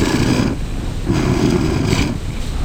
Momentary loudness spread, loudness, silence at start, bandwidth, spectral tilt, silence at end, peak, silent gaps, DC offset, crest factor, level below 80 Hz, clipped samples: 9 LU; -18 LUFS; 0 s; 18 kHz; -6 dB/octave; 0 s; 0 dBFS; none; under 0.1%; 16 dB; -24 dBFS; under 0.1%